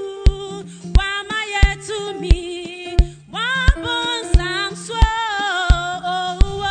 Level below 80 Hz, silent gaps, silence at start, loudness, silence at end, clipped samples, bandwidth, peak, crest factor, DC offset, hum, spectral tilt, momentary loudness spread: -20 dBFS; none; 0 s; -20 LUFS; 0 s; under 0.1%; 9.4 kHz; -2 dBFS; 16 dB; 0.2%; none; -4.5 dB/octave; 8 LU